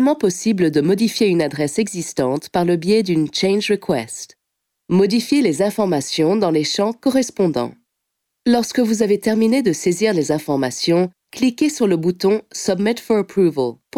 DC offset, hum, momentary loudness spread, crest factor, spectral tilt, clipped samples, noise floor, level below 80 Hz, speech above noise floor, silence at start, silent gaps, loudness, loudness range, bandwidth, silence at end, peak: under 0.1%; none; 5 LU; 14 dB; -5 dB/octave; under 0.1%; -77 dBFS; -58 dBFS; 60 dB; 0 s; none; -18 LUFS; 1 LU; 16.5 kHz; 0 s; -4 dBFS